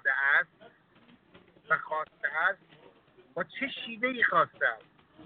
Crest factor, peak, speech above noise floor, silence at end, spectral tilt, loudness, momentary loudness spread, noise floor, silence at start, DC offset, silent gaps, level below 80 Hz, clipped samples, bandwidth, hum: 20 dB; -12 dBFS; 31 dB; 0 s; -7 dB/octave; -29 LUFS; 14 LU; -61 dBFS; 0.05 s; under 0.1%; none; -76 dBFS; under 0.1%; 4.6 kHz; none